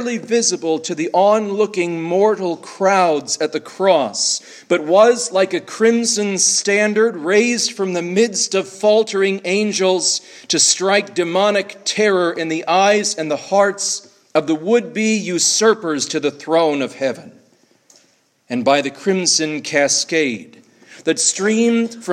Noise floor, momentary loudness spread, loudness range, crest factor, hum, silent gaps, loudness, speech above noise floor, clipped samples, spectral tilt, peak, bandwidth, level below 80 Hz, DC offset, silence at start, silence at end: -58 dBFS; 8 LU; 3 LU; 16 dB; none; none; -16 LUFS; 41 dB; under 0.1%; -2.5 dB/octave; 0 dBFS; 14 kHz; -72 dBFS; under 0.1%; 0 s; 0 s